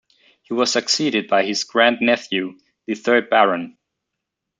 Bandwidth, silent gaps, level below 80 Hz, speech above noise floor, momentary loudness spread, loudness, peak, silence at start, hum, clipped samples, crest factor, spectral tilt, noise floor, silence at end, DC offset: 9.4 kHz; none; -70 dBFS; 62 dB; 13 LU; -18 LUFS; -2 dBFS; 0.5 s; none; under 0.1%; 20 dB; -2.5 dB/octave; -81 dBFS; 0.9 s; under 0.1%